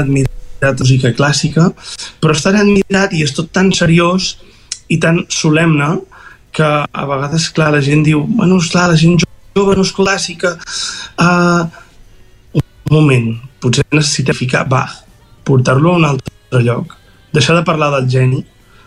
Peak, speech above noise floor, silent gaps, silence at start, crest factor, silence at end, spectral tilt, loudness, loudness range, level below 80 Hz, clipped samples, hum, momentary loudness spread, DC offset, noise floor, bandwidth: 0 dBFS; 29 dB; none; 0 s; 12 dB; 0.45 s; -5.5 dB/octave; -12 LUFS; 3 LU; -38 dBFS; under 0.1%; none; 10 LU; under 0.1%; -41 dBFS; 11.5 kHz